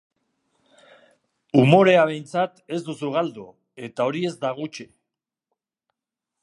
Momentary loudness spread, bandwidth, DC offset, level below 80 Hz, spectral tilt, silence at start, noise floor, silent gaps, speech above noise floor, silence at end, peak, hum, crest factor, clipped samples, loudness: 20 LU; 11.5 kHz; under 0.1%; -70 dBFS; -7 dB/octave; 1.55 s; -85 dBFS; none; 65 dB; 1.6 s; -2 dBFS; none; 22 dB; under 0.1%; -21 LUFS